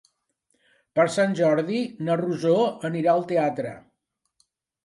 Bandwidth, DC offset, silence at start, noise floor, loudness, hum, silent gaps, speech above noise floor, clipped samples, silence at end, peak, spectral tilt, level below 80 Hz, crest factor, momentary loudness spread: 11.5 kHz; under 0.1%; 0.95 s; -77 dBFS; -23 LUFS; none; none; 55 dB; under 0.1%; 1.05 s; -8 dBFS; -6.5 dB/octave; -72 dBFS; 16 dB; 6 LU